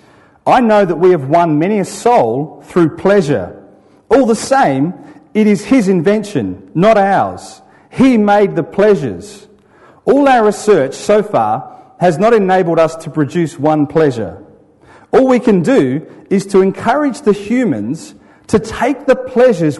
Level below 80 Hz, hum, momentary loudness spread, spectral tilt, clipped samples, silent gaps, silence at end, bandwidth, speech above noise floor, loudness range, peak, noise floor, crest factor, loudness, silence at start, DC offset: -48 dBFS; none; 10 LU; -6.5 dB/octave; under 0.1%; none; 0 s; 11.5 kHz; 33 dB; 2 LU; -2 dBFS; -45 dBFS; 12 dB; -12 LUFS; 0.45 s; under 0.1%